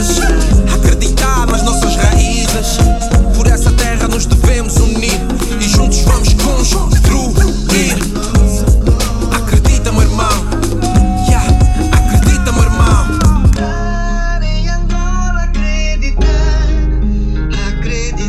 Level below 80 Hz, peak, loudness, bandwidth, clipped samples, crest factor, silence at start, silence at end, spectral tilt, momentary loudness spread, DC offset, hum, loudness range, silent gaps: -12 dBFS; 0 dBFS; -13 LUFS; 14.5 kHz; under 0.1%; 10 dB; 0 s; 0 s; -5 dB/octave; 6 LU; under 0.1%; none; 4 LU; none